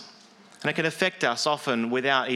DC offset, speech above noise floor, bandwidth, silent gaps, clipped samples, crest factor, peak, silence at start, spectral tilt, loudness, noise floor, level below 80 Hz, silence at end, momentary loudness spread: under 0.1%; 27 dB; 15 kHz; none; under 0.1%; 20 dB; -6 dBFS; 0 s; -3.5 dB/octave; -25 LUFS; -52 dBFS; -78 dBFS; 0 s; 4 LU